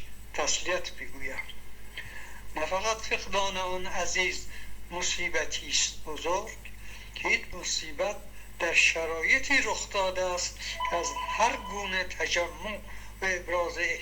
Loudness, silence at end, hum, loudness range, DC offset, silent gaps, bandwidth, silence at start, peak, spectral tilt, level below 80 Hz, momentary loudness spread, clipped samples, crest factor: -29 LUFS; 0 s; none; 6 LU; under 0.1%; none; over 20 kHz; 0 s; -8 dBFS; -1 dB/octave; -48 dBFS; 18 LU; under 0.1%; 22 dB